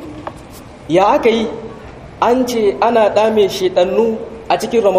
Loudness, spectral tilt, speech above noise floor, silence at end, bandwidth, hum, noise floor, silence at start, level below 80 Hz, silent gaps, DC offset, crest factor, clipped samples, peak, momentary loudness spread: -14 LUFS; -5 dB/octave; 22 dB; 0 s; 15.5 kHz; none; -35 dBFS; 0 s; -44 dBFS; none; under 0.1%; 14 dB; under 0.1%; 0 dBFS; 21 LU